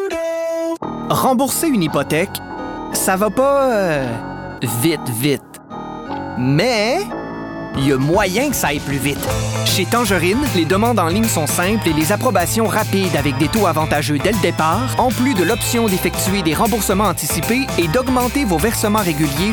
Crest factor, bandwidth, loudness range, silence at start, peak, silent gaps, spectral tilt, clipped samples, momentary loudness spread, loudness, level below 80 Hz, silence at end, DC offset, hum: 12 dB; over 20 kHz; 3 LU; 0 s; -4 dBFS; none; -4.5 dB/octave; under 0.1%; 9 LU; -17 LUFS; -36 dBFS; 0 s; under 0.1%; none